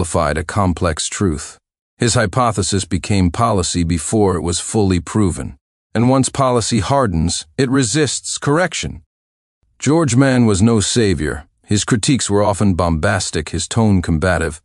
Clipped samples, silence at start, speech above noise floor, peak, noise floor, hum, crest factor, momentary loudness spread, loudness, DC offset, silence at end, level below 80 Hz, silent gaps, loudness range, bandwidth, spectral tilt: under 0.1%; 0 s; over 74 dB; 0 dBFS; under -90 dBFS; none; 16 dB; 7 LU; -16 LUFS; under 0.1%; 0.1 s; -34 dBFS; 1.81-1.97 s, 5.61-5.90 s, 9.06-9.61 s; 2 LU; 12 kHz; -5 dB/octave